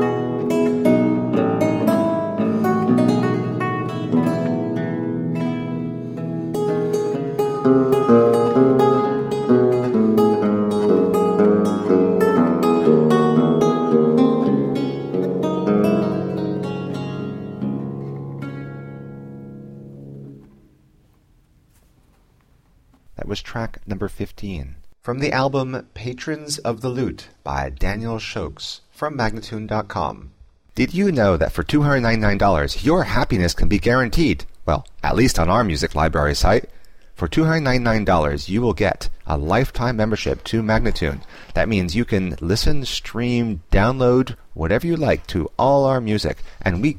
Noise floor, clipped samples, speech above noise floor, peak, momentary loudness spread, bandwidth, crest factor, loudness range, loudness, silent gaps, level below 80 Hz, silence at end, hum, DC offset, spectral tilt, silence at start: -56 dBFS; under 0.1%; 37 dB; -2 dBFS; 13 LU; 16 kHz; 16 dB; 13 LU; -19 LUFS; none; -32 dBFS; 0 s; none; under 0.1%; -6.5 dB/octave; 0 s